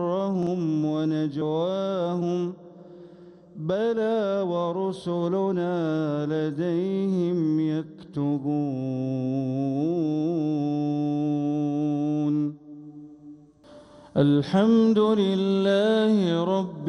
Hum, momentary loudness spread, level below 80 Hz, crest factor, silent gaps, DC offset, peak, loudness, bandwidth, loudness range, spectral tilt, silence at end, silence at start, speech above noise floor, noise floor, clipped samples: none; 8 LU; -68 dBFS; 14 dB; none; under 0.1%; -10 dBFS; -25 LUFS; 10 kHz; 5 LU; -8 dB/octave; 0 s; 0 s; 27 dB; -50 dBFS; under 0.1%